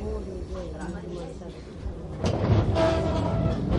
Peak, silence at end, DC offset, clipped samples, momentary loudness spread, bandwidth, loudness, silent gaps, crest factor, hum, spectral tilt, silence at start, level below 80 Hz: -10 dBFS; 0 s; under 0.1%; under 0.1%; 15 LU; 10.5 kHz; -28 LUFS; none; 18 dB; none; -7.5 dB/octave; 0 s; -34 dBFS